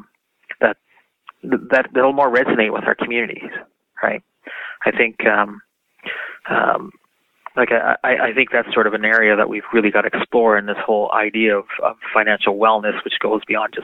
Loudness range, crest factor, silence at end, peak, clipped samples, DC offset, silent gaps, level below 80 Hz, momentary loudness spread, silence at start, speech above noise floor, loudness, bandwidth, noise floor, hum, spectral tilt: 5 LU; 18 dB; 0 s; 0 dBFS; under 0.1%; under 0.1%; none; -66 dBFS; 13 LU; 0.5 s; 42 dB; -17 LUFS; 5.8 kHz; -60 dBFS; none; -6.5 dB/octave